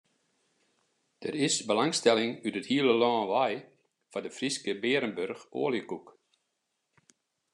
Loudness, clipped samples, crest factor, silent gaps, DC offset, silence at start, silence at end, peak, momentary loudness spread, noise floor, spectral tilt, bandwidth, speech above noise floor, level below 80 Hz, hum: -29 LUFS; under 0.1%; 22 dB; none; under 0.1%; 1.2 s; 1.5 s; -8 dBFS; 14 LU; -81 dBFS; -3.5 dB/octave; 12 kHz; 52 dB; -82 dBFS; none